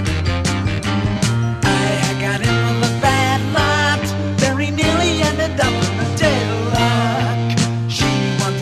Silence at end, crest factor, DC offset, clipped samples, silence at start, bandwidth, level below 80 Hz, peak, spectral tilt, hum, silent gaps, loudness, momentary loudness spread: 0 s; 16 dB; under 0.1%; under 0.1%; 0 s; 14 kHz; -34 dBFS; 0 dBFS; -5 dB/octave; none; none; -17 LUFS; 4 LU